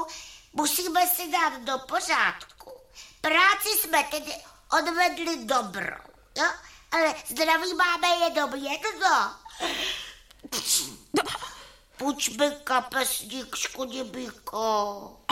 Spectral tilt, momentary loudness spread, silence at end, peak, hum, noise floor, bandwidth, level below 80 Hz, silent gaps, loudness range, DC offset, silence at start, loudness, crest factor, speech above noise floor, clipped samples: -1 dB/octave; 14 LU; 0.2 s; -8 dBFS; none; -49 dBFS; 16.5 kHz; -60 dBFS; none; 4 LU; under 0.1%; 0 s; -26 LUFS; 20 dB; 23 dB; under 0.1%